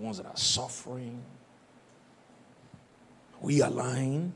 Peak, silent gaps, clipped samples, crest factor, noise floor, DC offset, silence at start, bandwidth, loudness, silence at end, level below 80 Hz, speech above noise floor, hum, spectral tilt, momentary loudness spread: -12 dBFS; none; under 0.1%; 22 dB; -59 dBFS; under 0.1%; 0 s; 11.5 kHz; -30 LUFS; 0 s; -70 dBFS; 28 dB; none; -4 dB/octave; 16 LU